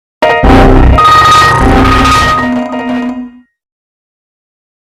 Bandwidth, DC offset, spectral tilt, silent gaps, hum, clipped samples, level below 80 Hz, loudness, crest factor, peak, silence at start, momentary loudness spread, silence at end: 16 kHz; under 0.1%; -5.5 dB/octave; none; none; under 0.1%; -14 dBFS; -6 LUFS; 8 dB; 0 dBFS; 0.2 s; 11 LU; 1.65 s